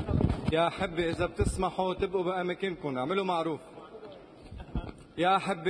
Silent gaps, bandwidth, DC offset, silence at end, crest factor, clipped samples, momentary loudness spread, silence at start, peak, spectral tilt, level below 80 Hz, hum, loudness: none; 10.5 kHz; under 0.1%; 0 s; 18 dB; under 0.1%; 20 LU; 0 s; -14 dBFS; -6 dB/octave; -44 dBFS; none; -31 LUFS